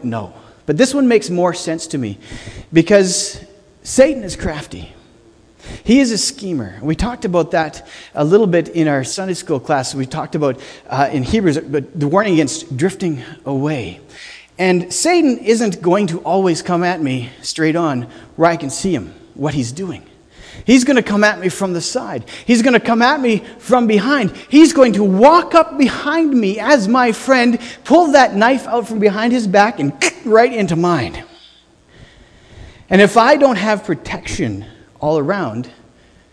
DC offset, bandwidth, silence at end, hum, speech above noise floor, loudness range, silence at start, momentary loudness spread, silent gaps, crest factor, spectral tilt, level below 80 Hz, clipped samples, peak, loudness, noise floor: under 0.1%; 11 kHz; 0.6 s; none; 34 dB; 6 LU; 0 s; 14 LU; none; 16 dB; -5 dB/octave; -42 dBFS; under 0.1%; 0 dBFS; -15 LUFS; -48 dBFS